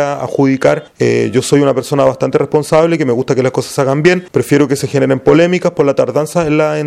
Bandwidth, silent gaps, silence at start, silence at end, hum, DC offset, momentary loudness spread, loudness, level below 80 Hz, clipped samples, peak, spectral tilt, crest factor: 16 kHz; none; 0 s; 0 s; none; under 0.1%; 4 LU; -12 LUFS; -48 dBFS; under 0.1%; 0 dBFS; -6 dB/octave; 12 dB